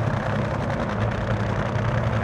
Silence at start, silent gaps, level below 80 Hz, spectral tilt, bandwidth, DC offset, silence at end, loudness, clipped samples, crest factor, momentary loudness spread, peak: 0 s; none; -36 dBFS; -7.5 dB/octave; 9.2 kHz; under 0.1%; 0 s; -25 LUFS; under 0.1%; 14 dB; 2 LU; -10 dBFS